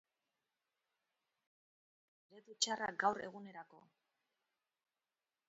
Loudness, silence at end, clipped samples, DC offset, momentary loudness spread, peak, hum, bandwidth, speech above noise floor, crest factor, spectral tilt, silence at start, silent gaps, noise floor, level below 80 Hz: -39 LUFS; 1.7 s; under 0.1%; under 0.1%; 17 LU; -20 dBFS; none; 7.6 kHz; over 48 dB; 26 dB; 0 dB/octave; 2.3 s; none; under -90 dBFS; -88 dBFS